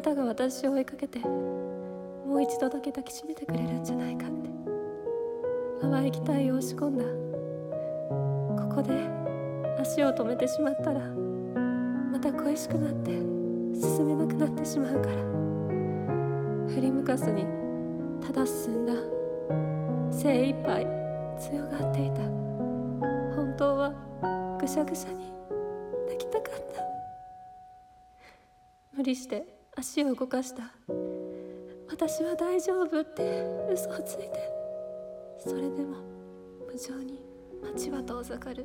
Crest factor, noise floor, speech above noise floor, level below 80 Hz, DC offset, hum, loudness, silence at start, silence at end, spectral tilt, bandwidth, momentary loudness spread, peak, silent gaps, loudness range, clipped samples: 16 dB; -61 dBFS; 31 dB; -60 dBFS; under 0.1%; none; -31 LUFS; 0 s; 0 s; -6.5 dB/octave; 17.5 kHz; 11 LU; -14 dBFS; none; 8 LU; under 0.1%